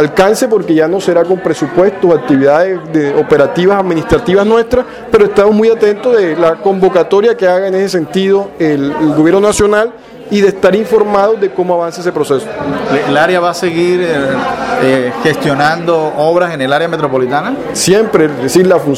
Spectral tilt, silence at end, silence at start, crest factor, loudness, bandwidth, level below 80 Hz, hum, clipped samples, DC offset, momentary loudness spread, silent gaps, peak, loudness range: -5.5 dB/octave; 0 s; 0 s; 10 dB; -11 LUFS; 15.5 kHz; -40 dBFS; none; 0.2%; under 0.1%; 5 LU; none; 0 dBFS; 2 LU